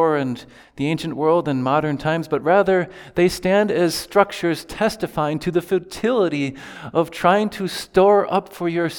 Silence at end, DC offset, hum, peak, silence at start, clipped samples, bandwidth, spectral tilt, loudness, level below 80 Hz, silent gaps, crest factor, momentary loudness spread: 0 s; under 0.1%; none; 0 dBFS; 0 s; under 0.1%; 19.5 kHz; -5.5 dB/octave; -20 LUFS; -50 dBFS; none; 18 dB; 8 LU